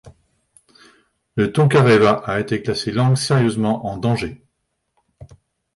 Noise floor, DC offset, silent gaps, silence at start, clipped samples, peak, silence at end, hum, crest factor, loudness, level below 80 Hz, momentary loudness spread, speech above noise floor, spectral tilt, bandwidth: -73 dBFS; under 0.1%; none; 0.05 s; under 0.1%; -4 dBFS; 0.5 s; none; 16 dB; -18 LUFS; -50 dBFS; 9 LU; 56 dB; -6.5 dB/octave; 11.5 kHz